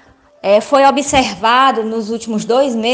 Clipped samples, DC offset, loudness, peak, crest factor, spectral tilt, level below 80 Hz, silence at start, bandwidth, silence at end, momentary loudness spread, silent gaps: under 0.1%; under 0.1%; -13 LUFS; 0 dBFS; 14 dB; -3.5 dB/octave; -46 dBFS; 0.45 s; 10 kHz; 0 s; 9 LU; none